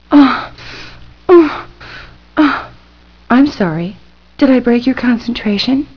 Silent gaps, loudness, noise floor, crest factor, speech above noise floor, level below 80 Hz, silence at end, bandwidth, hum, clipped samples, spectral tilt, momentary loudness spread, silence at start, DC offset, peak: none; -12 LUFS; -44 dBFS; 14 dB; 31 dB; -42 dBFS; 0.1 s; 5.4 kHz; 60 Hz at -45 dBFS; 0.1%; -7 dB/octave; 22 LU; 0.1 s; 0.5%; 0 dBFS